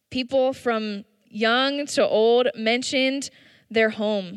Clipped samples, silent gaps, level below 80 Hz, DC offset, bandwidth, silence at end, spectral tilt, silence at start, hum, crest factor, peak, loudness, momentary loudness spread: under 0.1%; none; -68 dBFS; under 0.1%; 12.5 kHz; 0 s; -3.5 dB/octave; 0.1 s; none; 14 dB; -8 dBFS; -22 LUFS; 12 LU